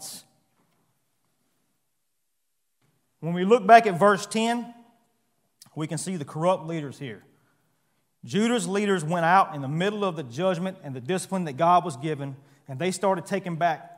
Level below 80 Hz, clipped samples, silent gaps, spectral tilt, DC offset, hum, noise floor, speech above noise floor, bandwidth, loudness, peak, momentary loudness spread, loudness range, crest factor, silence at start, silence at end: -78 dBFS; under 0.1%; none; -5 dB/octave; under 0.1%; none; -80 dBFS; 56 dB; 16 kHz; -24 LUFS; 0 dBFS; 16 LU; 9 LU; 26 dB; 0 s; 0.05 s